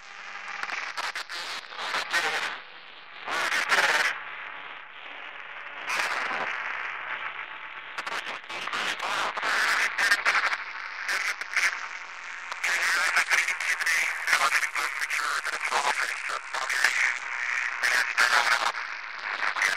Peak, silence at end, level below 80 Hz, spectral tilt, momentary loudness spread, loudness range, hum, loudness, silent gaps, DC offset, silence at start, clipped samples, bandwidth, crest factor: -6 dBFS; 0 s; -78 dBFS; 1.5 dB/octave; 15 LU; 7 LU; none; -26 LUFS; none; 0.2%; 0 s; under 0.1%; 16 kHz; 22 dB